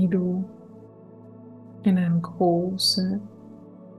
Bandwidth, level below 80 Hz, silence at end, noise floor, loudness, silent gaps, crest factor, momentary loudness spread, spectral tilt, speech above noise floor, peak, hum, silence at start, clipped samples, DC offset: 12.5 kHz; -66 dBFS; 0 s; -46 dBFS; -24 LUFS; none; 16 dB; 24 LU; -6 dB/octave; 24 dB; -10 dBFS; none; 0 s; under 0.1%; under 0.1%